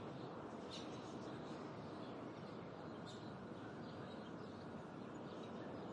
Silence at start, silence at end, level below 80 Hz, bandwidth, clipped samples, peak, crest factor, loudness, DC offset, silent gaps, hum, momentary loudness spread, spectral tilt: 0 s; 0 s; -80 dBFS; 10.5 kHz; under 0.1%; -38 dBFS; 14 dB; -52 LUFS; under 0.1%; none; none; 2 LU; -6 dB/octave